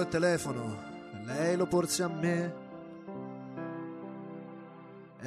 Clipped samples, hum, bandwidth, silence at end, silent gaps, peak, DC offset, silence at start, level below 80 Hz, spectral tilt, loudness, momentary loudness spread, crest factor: under 0.1%; none; 13 kHz; 0 s; none; -16 dBFS; under 0.1%; 0 s; -66 dBFS; -5 dB/octave; -33 LUFS; 18 LU; 18 dB